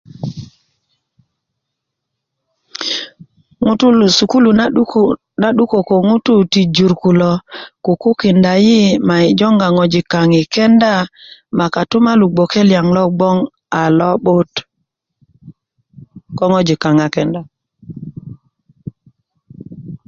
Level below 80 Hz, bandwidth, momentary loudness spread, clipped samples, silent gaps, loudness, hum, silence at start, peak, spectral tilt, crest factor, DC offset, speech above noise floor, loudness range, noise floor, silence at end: -50 dBFS; 7.6 kHz; 20 LU; under 0.1%; none; -12 LUFS; none; 0.2 s; 0 dBFS; -6 dB/octave; 14 dB; under 0.1%; 65 dB; 7 LU; -76 dBFS; 0.1 s